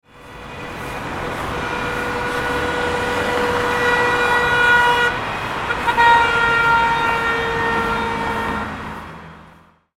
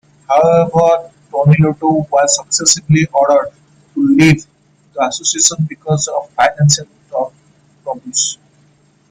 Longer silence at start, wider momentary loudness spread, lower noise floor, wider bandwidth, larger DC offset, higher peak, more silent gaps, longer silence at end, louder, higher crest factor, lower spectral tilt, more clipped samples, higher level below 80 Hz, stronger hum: second, 0.15 s vs 0.3 s; about the same, 16 LU vs 14 LU; second, -48 dBFS vs -52 dBFS; first, 16.5 kHz vs 10.5 kHz; neither; about the same, -2 dBFS vs 0 dBFS; neither; second, 0.5 s vs 0.75 s; second, -17 LUFS vs -13 LUFS; about the same, 18 dB vs 14 dB; about the same, -4 dB/octave vs -4.5 dB/octave; neither; first, -40 dBFS vs -48 dBFS; neither